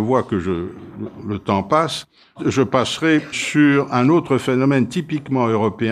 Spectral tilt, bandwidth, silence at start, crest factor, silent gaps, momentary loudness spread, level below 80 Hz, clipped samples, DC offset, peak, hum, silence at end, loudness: -6 dB/octave; 12.5 kHz; 0 s; 16 dB; none; 11 LU; -52 dBFS; under 0.1%; under 0.1%; -2 dBFS; none; 0 s; -18 LUFS